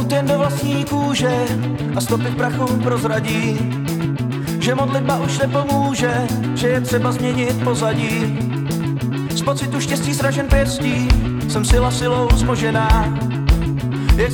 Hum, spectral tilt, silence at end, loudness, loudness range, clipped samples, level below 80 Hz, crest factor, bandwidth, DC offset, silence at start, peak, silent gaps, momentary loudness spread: none; -5.5 dB/octave; 0 s; -18 LUFS; 2 LU; under 0.1%; -24 dBFS; 14 dB; over 20 kHz; under 0.1%; 0 s; -4 dBFS; none; 5 LU